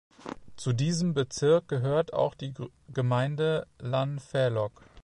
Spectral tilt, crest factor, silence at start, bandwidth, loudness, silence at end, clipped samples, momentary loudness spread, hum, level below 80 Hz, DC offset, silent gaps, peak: -6 dB/octave; 16 dB; 0.25 s; 11 kHz; -29 LUFS; 0.05 s; under 0.1%; 13 LU; none; -60 dBFS; under 0.1%; none; -12 dBFS